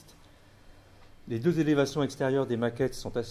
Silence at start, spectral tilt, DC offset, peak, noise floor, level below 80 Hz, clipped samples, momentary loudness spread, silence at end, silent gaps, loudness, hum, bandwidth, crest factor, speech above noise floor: 0.05 s; -6.5 dB/octave; under 0.1%; -14 dBFS; -55 dBFS; -56 dBFS; under 0.1%; 7 LU; 0 s; none; -29 LUFS; none; 15 kHz; 16 dB; 28 dB